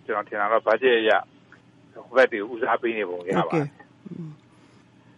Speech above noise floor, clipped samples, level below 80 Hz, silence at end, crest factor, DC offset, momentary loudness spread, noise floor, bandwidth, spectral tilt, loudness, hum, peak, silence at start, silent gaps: 31 dB; under 0.1%; -72 dBFS; 0.85 s; 18 dB; under 0.1%; 19 LU; -54 dBFS; 10.5 kHz; -6.5 dB/octave; -23 LUFS; none; -6 dBFS; 0.1 s; none